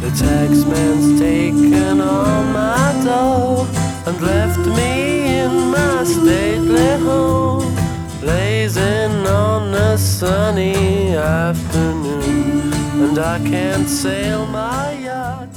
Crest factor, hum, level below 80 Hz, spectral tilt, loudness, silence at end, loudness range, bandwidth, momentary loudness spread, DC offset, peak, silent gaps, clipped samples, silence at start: 14 dB; none; -32 dBFS; -6 dB/octave; -16 LUFS; 0 s; 3 LU; 19 kHz; 6 LU; under 0.1%; -2 dBFS; none; under 0.1%; 0 s